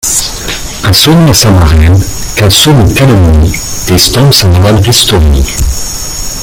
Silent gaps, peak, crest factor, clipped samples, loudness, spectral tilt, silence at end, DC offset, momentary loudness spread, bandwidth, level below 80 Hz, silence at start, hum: none; 0 dBFS; 6 dB; 2%; -6 LUFS; -4 dB/octave; 0 s; under 0.1%; 10 LU; over 20 kHz; -16 dBFS; 0.05 s; none